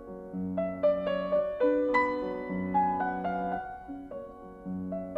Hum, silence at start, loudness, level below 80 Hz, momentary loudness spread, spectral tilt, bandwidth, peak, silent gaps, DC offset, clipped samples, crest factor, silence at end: none; 0 s; -30 LUFS; -58 dBFS; 15 LU; -8.5 dB/octave; 7.8 kHz; -12 dBFS; none; under 0.1%; under 0.1%; 18 dB; 0 s